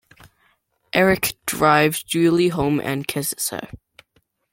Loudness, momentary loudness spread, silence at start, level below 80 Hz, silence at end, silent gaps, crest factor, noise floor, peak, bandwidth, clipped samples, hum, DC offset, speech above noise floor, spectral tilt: -19 LUFS; 9 LU; 0.95 s; -50 dBFS; 0.75 s; none; 20 dB; -65 dBFS; -2 dBFS; 16.5 kHz; under 0.1%; none; under 0.1%; 46 dB; -4.5 dB/octave